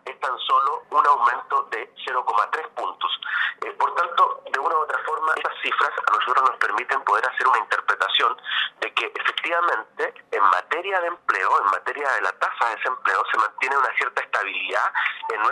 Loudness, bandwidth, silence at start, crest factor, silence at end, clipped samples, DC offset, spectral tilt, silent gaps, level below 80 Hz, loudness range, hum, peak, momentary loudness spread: -22 LUFS; 12 kHz; 0.05 s; 18 dB; 0 s; under 0.1%; under 0.1%; 0 dB/octave; none; -84 dBFS; 2 LU; none; -4 dBFS; 6 LU